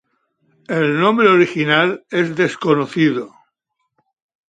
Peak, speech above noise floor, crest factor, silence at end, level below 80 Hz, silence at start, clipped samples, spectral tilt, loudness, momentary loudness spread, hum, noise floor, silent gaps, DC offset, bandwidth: 0 dBFS; 57 dB; 18 dB; 1.2 s; -66 dBFS; 0.7 s; under 0.1%; -6.5 dB/octave; -16 LUFS; 9 LU; none; -73 dBFS; none; under 0.1%; 9.2 kHz